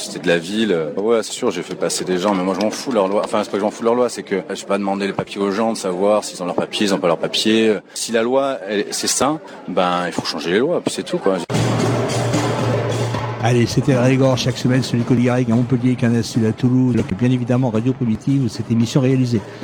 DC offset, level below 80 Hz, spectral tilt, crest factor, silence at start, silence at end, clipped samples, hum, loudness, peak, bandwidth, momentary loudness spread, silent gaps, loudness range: under 0.1%; -50 dBFS; -5.5 dB/octave; 16 dB; 0 s; 0 s; under 0.1%; none; -18 LUFS; -2 dBFS; 19 kHz; 6 LU; none; 3 LU